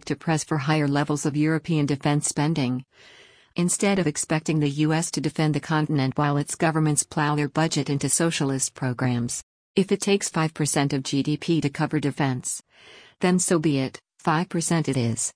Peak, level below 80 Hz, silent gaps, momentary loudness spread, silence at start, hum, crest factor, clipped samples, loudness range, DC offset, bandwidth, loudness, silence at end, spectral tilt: -6 dBFS; -60 dBFS; 9.43-9.74 s; 5 LU; 0.05 s; none; 18 dB; under 0.1%; 2 LU; under 0.1%; 10.5 kHz; -24 LUFS; 0.05 s; -5 dB/octave